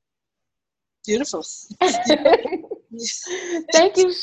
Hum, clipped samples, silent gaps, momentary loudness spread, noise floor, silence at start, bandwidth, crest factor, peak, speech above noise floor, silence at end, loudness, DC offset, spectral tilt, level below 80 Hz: none; under 0.1%; none; 15 LU; -86 dBFS; 1.05 s; 9.4 kHz; 20 dB; 0 dBFS; 67 dB; 0 s; -20 LUFS; under 0.1%; -2 dB/octave; -60 dBFS